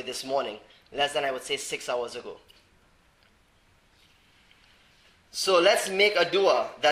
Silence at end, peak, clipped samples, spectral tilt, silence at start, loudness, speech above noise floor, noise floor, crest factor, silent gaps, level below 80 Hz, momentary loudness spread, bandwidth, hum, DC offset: 0 s; -6 dBFS; under 0.1%; -2 dB/octave; 0 s; -25 LUFS; 36 dB; -62 dBFS; 22 dB; none; -66 dBFS; 17 LU; 15.5 kHz; none; under 0.1%